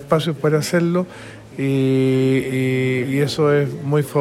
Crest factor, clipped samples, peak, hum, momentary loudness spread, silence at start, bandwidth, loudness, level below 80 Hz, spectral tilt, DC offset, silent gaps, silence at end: 14 dB; under 0.1%; -4 dBFS; none; 7 LU; 0 s; 15.5 kHz; -19 LUFS; -54 dBFS; -6.5 dB/octave; under 0.1%; none; 0 s